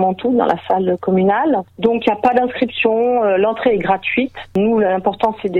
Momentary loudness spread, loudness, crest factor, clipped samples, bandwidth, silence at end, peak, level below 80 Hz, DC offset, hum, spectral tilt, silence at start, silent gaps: 4 LU; -16 LUFS; 14 dB; under 0.1%; 6.4 kHz; 0 s; -2 dBFS; -50 dBFS; under 0.1%; none; -8 dB/octave; 0 s; none